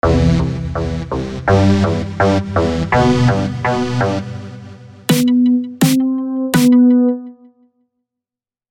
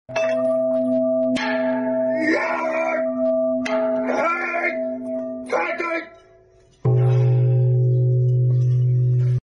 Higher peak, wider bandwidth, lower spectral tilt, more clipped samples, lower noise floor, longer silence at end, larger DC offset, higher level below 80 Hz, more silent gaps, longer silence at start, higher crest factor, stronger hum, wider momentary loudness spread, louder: first, 0 dBFS vs -8 dBFS; first, 16.5 kHz vs 6.8 kHz; second, -6.5 dB/octave vs -8.5 dB/octave; neither; first, -89 dBFS vs -53 dBFS; first, 1.4 s vs 0.05 s; neither; first, -32 dBFS vs -56 dBFS; neither; about the same, 0.05 s vs 0.1 s; about the same, 14 dB vs 12 dB; neither; first, 11 LU vs 7 LU; first, -15 LUFS vs -20 LUFS